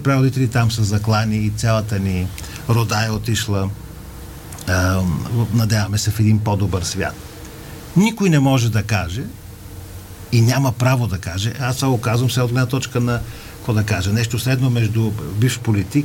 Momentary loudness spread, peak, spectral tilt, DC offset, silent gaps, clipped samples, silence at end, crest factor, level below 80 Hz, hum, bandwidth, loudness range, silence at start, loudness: 18 LU; -4 dBFS; -5.5 dB/octave; under 0.1%; none; under 0.1%; 0 s; 14 dB; -40 dBFS; none; 17 kHz; 2 LU; 0 s; -19 LUFS